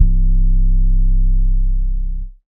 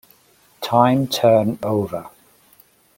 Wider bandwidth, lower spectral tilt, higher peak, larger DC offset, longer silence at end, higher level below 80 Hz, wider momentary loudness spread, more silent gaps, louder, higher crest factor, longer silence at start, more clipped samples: second, 0.4 kHz vs 17 kHz; first, -21 dB/octave vs -6 dB/octave; about the same, 0 dBFS vs -2 dBFS; neither; second, 0.15 s vs 0.9 s; first, -12 dBFS vs -58 dBFS; second, 6 LU vs 14 LU; neither; about the same, -20 LUFS vs -18 LUFS; second, 12 dB vs 18 dB; second, 0 s vs 0.6 s; neither